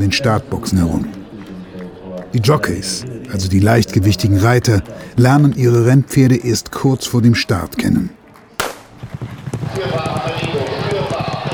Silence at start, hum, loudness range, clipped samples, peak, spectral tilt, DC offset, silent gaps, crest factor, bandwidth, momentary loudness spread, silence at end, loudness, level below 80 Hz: 0 s; none; 8 LU; under 0.1%; 0 dBFS; -6 dB/octave; under 0.1%; none; 14 dB; 19.5 kHz; 18 LU; 0 s; -15 LUFS; -38 dBFS